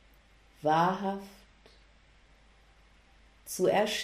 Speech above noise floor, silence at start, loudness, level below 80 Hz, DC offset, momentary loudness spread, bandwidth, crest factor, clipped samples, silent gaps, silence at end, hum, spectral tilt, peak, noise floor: 32 dB; 0.65 s; -30 LUFS; -62 dBFS; under 0.1%; 20 LU; 15.5 kHz; 18 dB; under 0.1%; none; 0 s; none; -4.5 dB/octave; -14 dBFS; -61 dBFS